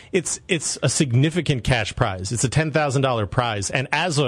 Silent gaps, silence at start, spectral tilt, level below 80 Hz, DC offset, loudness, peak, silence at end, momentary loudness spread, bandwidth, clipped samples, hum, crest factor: none; 0.05 s; -4.5 dB/octave; -44 dBFS; under 0.1%; -21 LUFS; -2 dBFS; 0 s; 4 LU; 12 kHz; under 0.1%; none; 20 dB